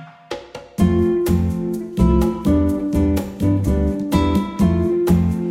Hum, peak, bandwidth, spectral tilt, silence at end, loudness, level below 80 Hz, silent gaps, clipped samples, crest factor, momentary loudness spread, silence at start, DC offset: none; -2 dBFS; 16.5 kHz; -8 dB/octave; 0 s; -18 LUFS; -26 dBFS; none; under 0.1%; 16 dB; 8 LU; 0 s; under 0.1%